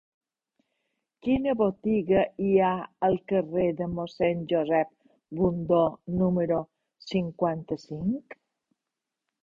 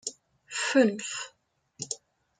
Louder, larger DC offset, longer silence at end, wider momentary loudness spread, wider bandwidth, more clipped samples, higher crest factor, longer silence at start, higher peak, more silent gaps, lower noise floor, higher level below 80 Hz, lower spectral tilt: about the same, -27 LUFS vs -29 LUFS; neither; first, 1.1 s vs 0.45 s; second, 10 LU vs 16 LU; second, 7.4 kHz vs 9.6 kHz; neither; about the same, 18 dB vs 22 dB; first, 1.25 s vs 0.05 s; about the same, -10 dBFS vs -10 dBFS; neither; first, -87 dBFS vs -54 dBFS; first, -56 dBFS vs -78 dBFS; first, -9 dB/octave vs -3 dB/octave